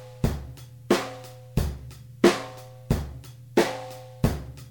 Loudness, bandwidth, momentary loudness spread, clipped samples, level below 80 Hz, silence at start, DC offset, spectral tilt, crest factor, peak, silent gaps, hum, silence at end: -27 LUFS; 19 kHz; 21 LU; under 0.1%; -38 dBFS; 0 s; under 0.1%; -5.5 dB/octave; 24 dB; -4 dBFS; none; none; 0 s